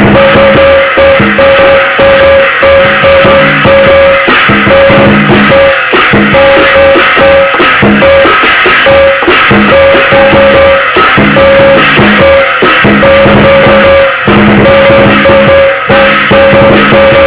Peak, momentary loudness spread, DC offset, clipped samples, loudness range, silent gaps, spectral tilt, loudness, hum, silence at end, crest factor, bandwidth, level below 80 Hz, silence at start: 0 dBFS; 1 LU; 0.3%; 7%; 0 LU; none; -9 dB/octave; -2 LUFS; none; 0 s; 2 dB; 4 kHz; -24 dBFS; 0 s